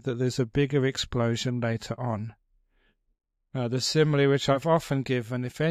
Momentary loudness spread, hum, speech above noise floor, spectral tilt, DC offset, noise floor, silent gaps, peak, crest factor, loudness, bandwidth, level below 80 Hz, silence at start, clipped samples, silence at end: 10 LU; none; 43 dB; -5.5 dB/octave; under 0.1%; -69 dBFS; none; -10 dBFS; 18 dB; -27 LUFS; 14.5 kHz; -54 dBFS; 0.05 s; under 0.1%; 0 s